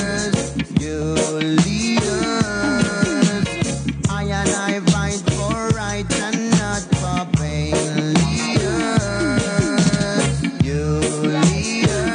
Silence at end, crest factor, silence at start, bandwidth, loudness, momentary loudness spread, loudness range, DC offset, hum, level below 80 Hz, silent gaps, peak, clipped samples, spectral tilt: 0 s; 16 dB; 0 s; 10 kHz; -19 LUFS; 4 LU; 1 LU; under 0.1%; none; -36 dBFS; none; -2 dBFS; under 0.1%; -5 dB/octave